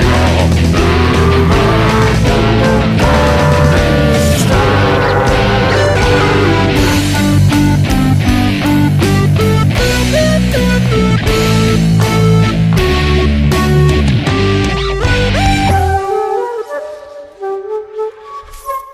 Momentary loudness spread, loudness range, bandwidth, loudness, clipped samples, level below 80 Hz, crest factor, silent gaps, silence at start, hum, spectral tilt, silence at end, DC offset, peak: 10 LU; 4 LU; 15.5 kHz; -11 LUFS; under 0.1%; -20 dBFS; 10 dB; none; 0 s; none; -6 dB/octave; 0 s; under 0.1%; 0 dBFS